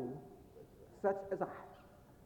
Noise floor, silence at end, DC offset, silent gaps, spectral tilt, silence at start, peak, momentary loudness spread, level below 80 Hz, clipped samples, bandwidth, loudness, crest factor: -61 dBFS; 0 s; under 0.1%; none; -8 dB/octave; 0 s; -22 dBFS; 21 LU; -70 dBFS; under 0.1%; 19 kHz; -41 LUFS; 22 dB